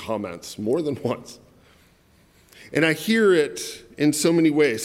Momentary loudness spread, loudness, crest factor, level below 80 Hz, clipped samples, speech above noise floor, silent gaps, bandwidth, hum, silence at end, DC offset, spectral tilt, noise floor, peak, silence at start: 14 LU; -22 LUFS; 18 dB; -62 dBFS; under 0.1%; 35 dB; none; 16.5 kHz; none; 0 s; under 0.1%; -4.5 dB/octave; -57 dBFS; -4 dBFS; 0 s